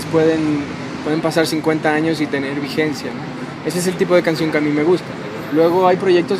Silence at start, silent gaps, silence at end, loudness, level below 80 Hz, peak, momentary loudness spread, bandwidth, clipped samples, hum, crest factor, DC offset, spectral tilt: 0 s; none; 0 s; -18 LUFS; -54 dBFS; 0 dBFS; 11 LU; 15.5 kHz; under 0.1%; none; 18 dB; under 0.1%; -5.5 dB/octave